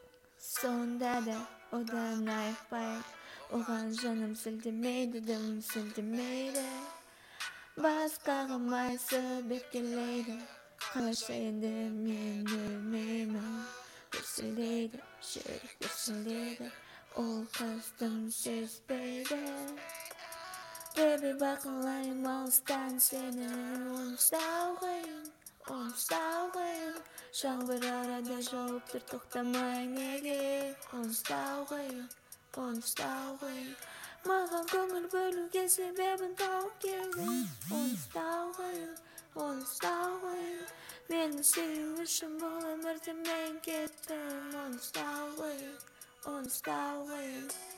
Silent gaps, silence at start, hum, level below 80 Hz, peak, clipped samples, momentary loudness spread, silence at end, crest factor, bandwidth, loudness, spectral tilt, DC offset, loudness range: none; 0 s; none; -76 dBFS; -14 dBFS; under 0.1%; 13 LU; 0 s; 24 dB; 17 kHz; -37 LUFS; -2.5 dB/octave; under 0.1%; 7 LU